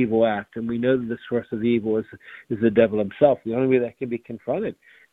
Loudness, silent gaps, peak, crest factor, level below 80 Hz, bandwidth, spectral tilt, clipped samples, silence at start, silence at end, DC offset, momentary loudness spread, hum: -23 LUFS; none; -4 dBFS; 18 dB; -58 dBFS; 4 kHz; -9.5 dB/octave; under 0.1%; 0 s; 0.4 s; under 0.1%; 11 LU; none